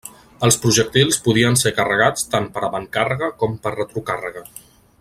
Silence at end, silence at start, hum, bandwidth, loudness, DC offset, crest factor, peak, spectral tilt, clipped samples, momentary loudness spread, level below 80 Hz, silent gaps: 0.4 s; 0.05 s; none; 16 kHz; -18 LUFS; under 0.1%; 18 dB; -2 dBFS; -3.5 dB/octave; under 0.1%; 11 LU; -50 dBFS; none